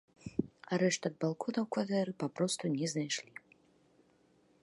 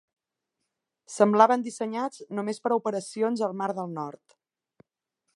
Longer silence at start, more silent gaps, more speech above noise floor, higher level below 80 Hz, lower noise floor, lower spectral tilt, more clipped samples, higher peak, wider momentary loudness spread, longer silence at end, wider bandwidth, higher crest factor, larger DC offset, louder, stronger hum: second, 0.25 s vs 1.1 s; neither; second, 34 dB vs 57 dB; first, -72 dBFS vs -84 dBFS; second, -69 dBFS vs -83 dBFS; about the same, -4.5 dB/octave vs -5.5 dB/octave; neither; second, -16 dBFS vs -4 dBFS; second, 7 LU vs 14 LU; first, 1.4 s vs 1.25 s; about the same, 11.5 kHz vs 11.5 kHz; about the same, 20 dB vs 24 dB; neither; second, -35 LUFS vs -26 LUFS; neither